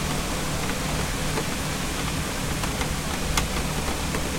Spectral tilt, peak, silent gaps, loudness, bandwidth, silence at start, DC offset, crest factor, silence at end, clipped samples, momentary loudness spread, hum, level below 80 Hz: -3.5 dB/octave; -8 dBFS; none; -27 LUFS; 16.5 kHz; 0 s; under 0.1%; 20 dB; 0 s; under 0.1%; 2 LU; none; -34 dBFS